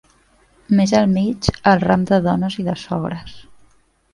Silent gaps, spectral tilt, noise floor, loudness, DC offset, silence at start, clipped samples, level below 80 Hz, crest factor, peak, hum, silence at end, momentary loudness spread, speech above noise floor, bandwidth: none; -6.5 dB/octave; -55 dBFS; -18 LUFS; under 0.1%; 0.7 s; under 0.1%; -42 dBFS; 18 dB; 0 dBFS; none; 0.7 s; 9 LU; 38 dB; 11 kHz